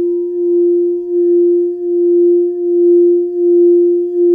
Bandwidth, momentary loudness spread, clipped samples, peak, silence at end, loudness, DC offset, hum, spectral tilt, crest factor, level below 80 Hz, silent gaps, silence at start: 1 kHz; 6 LU; under 0.1%; -4 dBFS; 0 s; -12 LUFS; under 0.1%; none; -11 dB/octave; 6 dB; -62 dBFS; none; 0 s